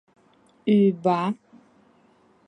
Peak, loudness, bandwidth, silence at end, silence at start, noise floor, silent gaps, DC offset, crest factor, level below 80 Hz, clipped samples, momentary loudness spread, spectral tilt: -8 dBFS; -22 LUFS; 5.8 kHz; 1.15 s; 0.65 s; -59 dBFS; none; under 0.1%; 18 dB; -70 dBFS; under 0.1%; 12 LU; -9 dB/octave